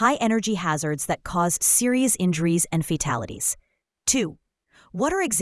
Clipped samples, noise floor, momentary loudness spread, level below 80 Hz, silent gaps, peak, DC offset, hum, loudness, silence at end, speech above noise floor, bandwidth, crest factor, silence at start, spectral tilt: under 0.1%; -58 dBFS; 9 LU; -50 dBFS; none; -6 dBFS; under 0.1%; none; -22 LUFS; 0 s; 36 dB; 12 kHz; 18 dB; 0 s; -4 dB/octave